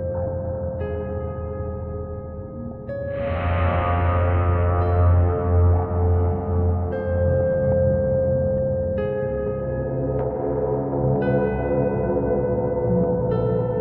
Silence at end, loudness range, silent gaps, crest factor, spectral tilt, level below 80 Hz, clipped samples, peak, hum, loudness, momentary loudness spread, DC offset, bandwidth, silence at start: 0 s; 6 LU; none; 12 dB; -13 dB/octave; -32 dBFS; under 0.1%; -8 dBFS; none; -22 LUFS; 10 LU; under 0.1%; 3.4 kHz; 0 s